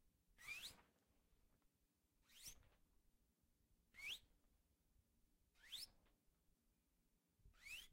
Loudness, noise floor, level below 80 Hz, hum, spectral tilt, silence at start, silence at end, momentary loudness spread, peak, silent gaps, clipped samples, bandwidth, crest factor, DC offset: -56 LUFS; -86 dBFS; -80 dBFS; none; 0.5 dB/octave; 0 s; 0 s; 9 LU; -42 dBFS; none; under 0.1%; 16 kHz; 22 dB; under 0.1%